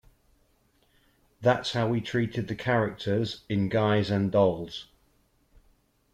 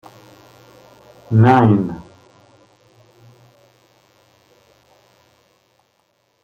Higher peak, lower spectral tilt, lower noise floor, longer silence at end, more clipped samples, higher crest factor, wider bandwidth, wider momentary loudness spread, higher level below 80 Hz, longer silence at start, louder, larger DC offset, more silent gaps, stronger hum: second, -10 dBFS vs -2 dBFS; second, -7 dB/octave vs -9 dB/octave; about the same, -67 dBFS vs -64 dBFS; second, 1.3 s vs 4.45 s; neither; about the same, 18 dB vs 20 dB; first, 10 kHz vs 6.8 kHz; second, 7 LU vs 16 LU; about the same, -60 dBFS vs -56 dBFS; about the same, 1.4 s vs 1.3 s; second, -27 LUFS vs -14 LUFS; neither; neither; neither